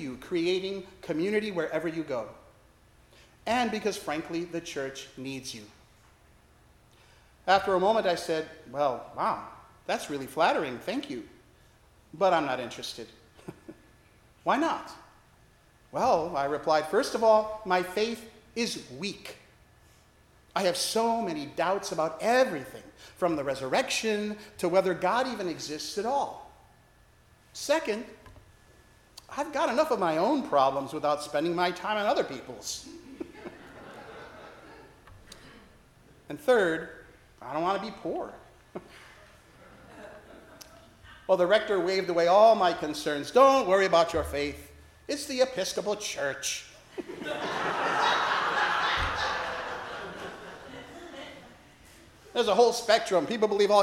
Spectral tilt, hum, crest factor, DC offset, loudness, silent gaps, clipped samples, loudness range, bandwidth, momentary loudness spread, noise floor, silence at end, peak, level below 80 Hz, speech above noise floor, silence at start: -3.5 dB/octave; none; 22 dB; under 0.1%; -28 LUFS; none; under 0.1%; 10 LU; 16.5 kHz; 21 LU; -60 dBFS; 0 s; -8 dBFS; -58 dBFS; 32 dB; 0 s